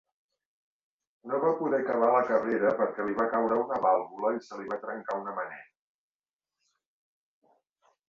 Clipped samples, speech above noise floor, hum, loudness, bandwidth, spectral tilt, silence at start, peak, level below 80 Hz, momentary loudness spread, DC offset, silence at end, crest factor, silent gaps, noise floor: under 0.1%; over 62 dB; none; -29 LUFS; 7.2 kHz; -7.5 dB/octave; 1.25 s; -12 dBFS; -74 dBFS; 11 LU; under 0.1%; 2.45 s; 20 dB; none; under -90 dBFS